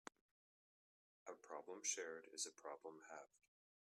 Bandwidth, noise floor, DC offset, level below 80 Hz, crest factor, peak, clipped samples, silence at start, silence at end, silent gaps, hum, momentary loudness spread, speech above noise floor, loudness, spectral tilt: 14 kHz; under -90 dBFS; under 0.1%; under -90 dBFS; 26 dB; -30 dBFS; under 0.1%; 1.25 s; 0.5 s; none; none; 16 LU; over 38 dB; -51 LUFS; 0.5 dB/octave